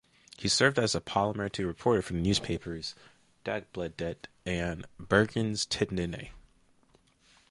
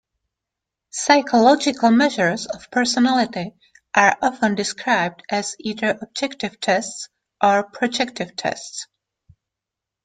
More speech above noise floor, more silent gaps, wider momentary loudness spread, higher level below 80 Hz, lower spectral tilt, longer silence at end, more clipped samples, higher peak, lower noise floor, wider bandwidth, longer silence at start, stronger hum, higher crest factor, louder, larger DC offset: second, 35 dB vs 66 dB; neither; about the same, 14 LU vs 15 LU; first, -52 dBFS vs -64 dBFS; about the same, -4 dB/octave vs -3.5 dB/octave; about the same, 1.1 s vs 1.2 s; neither; second, -8 dBFS vs -2 dBFS; second, -65 dBFS vs -85 dBFS; first, 11.5 kHz vs 9.4 kHz; second, 0.4 s vs 0.95 s; neither; about the same, 24 dB vs 20 dB; second, -30 LUFS vs -19 LUFS; neither